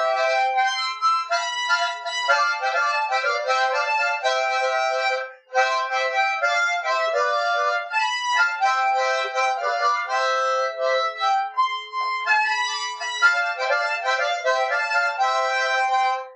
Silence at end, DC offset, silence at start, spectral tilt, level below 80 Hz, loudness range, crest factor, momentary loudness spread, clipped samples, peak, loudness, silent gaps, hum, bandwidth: 0 s; under 0.1%; 0 s; 5 dB/octave; under -90 dBFS; 1 LU; 16 dB; 3 LU; under 0.1%; -6 dBFS; -21 LUFS; none; none; 9.4 kHz